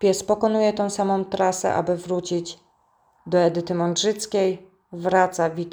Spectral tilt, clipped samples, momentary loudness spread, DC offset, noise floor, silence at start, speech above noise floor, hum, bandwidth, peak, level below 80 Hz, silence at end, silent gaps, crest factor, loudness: -4.5 dB/octave; under 0.1%; 8 LU; under 0.1%; -63 dBFS; 0 s; 41 dB; none; over 20 kHz; -4 dBFS; -62 dBFS; 0 s; none; 18 dB; -22 LUFS